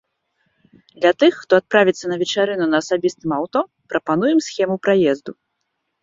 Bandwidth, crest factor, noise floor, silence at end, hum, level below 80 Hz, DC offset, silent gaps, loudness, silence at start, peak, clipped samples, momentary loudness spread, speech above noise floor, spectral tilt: 7.8 kHz; 18 dB; -74 dBFS; 0.7 s; none; -62 dBFS; under 0.1%; none; -18 LUFS; 1 s; -2 dBFS; under 0.1%; 9 LU; 56 dB; -5 dB/octave